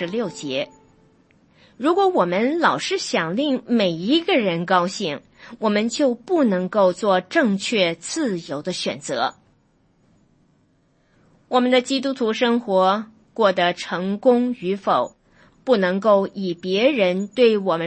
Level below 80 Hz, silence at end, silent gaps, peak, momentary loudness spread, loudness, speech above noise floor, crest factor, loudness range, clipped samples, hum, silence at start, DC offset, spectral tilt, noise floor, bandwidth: -66 dBFS; 0 s; none; -4 dBFS; 8 LU; -20 LUFS; 42 dB; 18 dB; 5 LU; under 0.1%; none; 0 s; under 0.1%; -5 dB/octave; -61 dBFS; 8.8 kHz